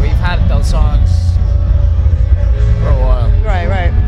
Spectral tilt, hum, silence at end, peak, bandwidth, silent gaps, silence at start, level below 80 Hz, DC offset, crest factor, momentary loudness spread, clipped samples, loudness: -7.5 dB/octave; none; 0 s; 0 dBFS; 8.2 kHz; none; 0 s; -12 dBFS; under 0.1%; 10 dB; 1 LU; under 0.1%; -13 LUFS